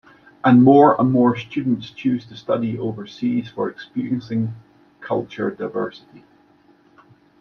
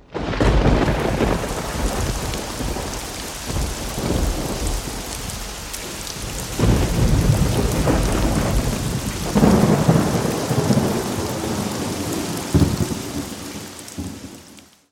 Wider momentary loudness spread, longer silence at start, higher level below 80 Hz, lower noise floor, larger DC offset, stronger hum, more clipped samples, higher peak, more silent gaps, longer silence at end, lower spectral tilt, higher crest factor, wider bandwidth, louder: first, 15 LU vs 11 LU; first, 0.45 s vs 0.1 s; second, -62 dBFS vs -28 dBFS; first, -55 dBFS vs -46 dBFS; neither; neither; neither; about the same, -2 dBFS vs 0 dBFS; neither; first, 1.5 s vs 0.3 s; first, -9 dB/octave vs -5.5 dB/octave; about the same, 18 dB vs 20 dB; second, 6.2 kHz vs 17 kHz; about the same, -20 LUFS vs -21 LUFS